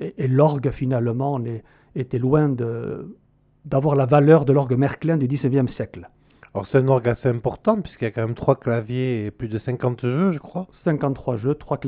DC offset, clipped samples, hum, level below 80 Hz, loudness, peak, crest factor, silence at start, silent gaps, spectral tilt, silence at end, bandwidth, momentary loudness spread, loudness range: under 0.1%; under 0.1%; none; -50 dBFS; -21 LUFS; -2 dBFS; 18 dB; 0 s; none; -8.5 dB/octave; 0 s; 4.5 kHz; 14 LU; 4 LU